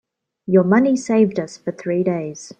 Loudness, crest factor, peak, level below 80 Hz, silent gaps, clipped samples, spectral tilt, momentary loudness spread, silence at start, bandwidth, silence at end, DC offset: -18 LUFS; 16 dB; -4 dBFS; -64 dBFS; none; under 0.1%; -7 dB/octave; 13 LU; 0.5 s; 9.2 kHz; 0.1 s; under 0.1%